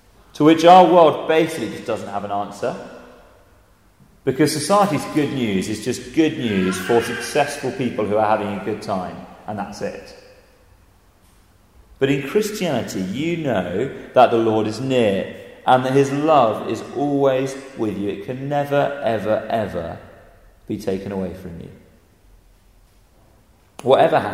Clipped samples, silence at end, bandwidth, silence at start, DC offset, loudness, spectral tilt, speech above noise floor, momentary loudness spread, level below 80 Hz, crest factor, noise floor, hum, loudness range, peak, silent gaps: under 0.1%; 0 s; 16 kHz; 0.35 s; under 0.1%; -19 LUFS; -5.5 dB/octave; 35 dB; 14 LU; -54 dBFS; 20 dB; -54 dBFS; none; 12 LU; 0 dBFS; none